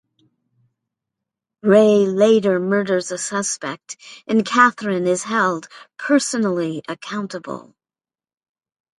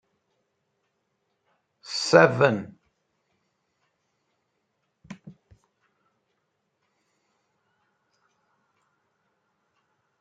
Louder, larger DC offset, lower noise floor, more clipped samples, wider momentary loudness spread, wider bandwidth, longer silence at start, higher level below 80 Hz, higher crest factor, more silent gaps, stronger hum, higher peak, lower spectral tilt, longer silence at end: first, -18 LUFS vs -21 LUFS; neither; first, under -90 dBFS vs -76 dBFS; neither; about the same, 17 LU vs 15 LU; first, 11.5 kHz vs 9 kHz; second, 1.65 s vs 1.9 s; first, -68 dBFS vs -74 dBFS; second, 20 dB vs 28 dB; neither; neither; about the same, 0 dBFS vs -2 dBFS; about the same, -4.5 dB/octave vs -5 dB/octave; second, 1.35 s vs 4.9 s